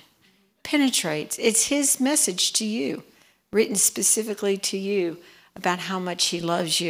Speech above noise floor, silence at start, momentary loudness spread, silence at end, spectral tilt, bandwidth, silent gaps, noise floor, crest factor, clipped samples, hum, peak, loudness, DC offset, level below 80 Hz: 38 dB; 0.65 s; 9 LU; 0 s; -2 dB/octave; 16.5 kHz; none; -62 dBFS; 18 dB; under 0.1%; none; -6 dBFS; -22 LUFS; under 0.1%; -68 dBFS